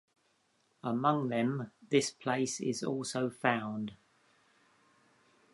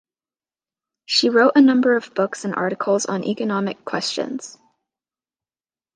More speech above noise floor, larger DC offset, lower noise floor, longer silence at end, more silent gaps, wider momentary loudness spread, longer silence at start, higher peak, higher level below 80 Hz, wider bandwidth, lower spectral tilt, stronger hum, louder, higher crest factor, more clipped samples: second, 41 dB vs over 71 dB; neither; second, -74 dBFS vs under -90 dBFS; first, 1.6 s vs 1.45 s; neither; about the same, 10 LU vs 12 LU; second, 0.85 s vs 1.1 s; second, -12 dBFS vs -2 dBFS; about the same, -78 dBFS vs -74 dBFS; first, 11.5 kHz vs 9.8 kHz; about the same, -4.5 dB/octave vs -4 dB/octave; neither; second, -33 LUFS vs -19 LUFS; first, 24 dB vs 18 dB; neither